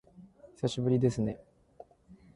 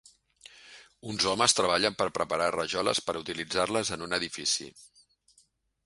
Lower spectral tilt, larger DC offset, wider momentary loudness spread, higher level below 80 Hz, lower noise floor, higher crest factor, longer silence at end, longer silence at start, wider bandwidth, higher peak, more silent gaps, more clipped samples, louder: first, -7.5 dB/octave vs -2 dB/octave; neither; second, 8 LU vs 11 LU; about the same, -60 dBFS vs -62 dBFS; second, -58 dBFS vs -67 dBFS; second, 18 dB vs 24 dB; second, 0.2 s vs 1 s; second, 0.2 s vs 0.55 s; about the same, 11.5 kHz vs 11.5 kHz; second, -16 dBFS vs -8 dBFS; neither; neither; second, -31 LUFS vs -28 LUFS